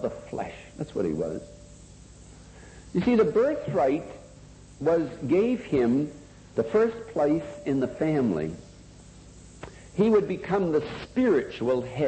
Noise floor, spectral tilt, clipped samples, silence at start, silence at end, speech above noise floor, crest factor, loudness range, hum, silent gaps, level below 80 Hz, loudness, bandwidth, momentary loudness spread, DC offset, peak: -48 dBFS; -7.5 dB/octave; under 0.1%; 0 s; 0 s; 23 dB; 16 dB; 3 LU; 50 Hz at -55 dBFS; none; -52 dBFS; -26 LUFS; 8.8 kHz; 15 LU; under 0.1%; -10 dBFS